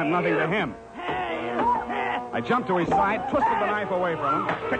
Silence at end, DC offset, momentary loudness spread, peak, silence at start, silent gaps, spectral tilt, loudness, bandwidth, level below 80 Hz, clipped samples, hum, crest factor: 0 s; under 0.1%; 6 LU; -12 dBFS; 0 s; none; -6.5 dB/octave; -25 LUFS; 9.4 kHz; -52 dBFS; under 0.1%; none; 12 dB